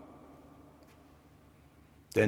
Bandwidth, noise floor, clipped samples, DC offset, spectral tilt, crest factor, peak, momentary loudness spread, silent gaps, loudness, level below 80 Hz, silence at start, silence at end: 16.5 kHz; -60 dBFS; under 0.1%; under 0.1%; -6.5 dB/octave; 26 dB; -12 dBFS; 9 LU; none; -42 LUFS; -66 dBFS; 2.15 s; 0 s